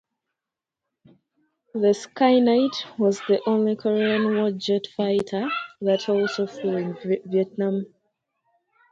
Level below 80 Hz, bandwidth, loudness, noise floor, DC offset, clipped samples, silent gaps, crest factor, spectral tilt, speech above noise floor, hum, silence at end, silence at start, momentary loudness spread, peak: -70 dBFS; 8 kHz; -23 LUFS; -87 dBFS; under 0.1%; under 0.1%; none; 18 dB; -6 dB/octave; 65 dB; none; 1.05 s; 1.75 s; 7 LU; -6 dBFS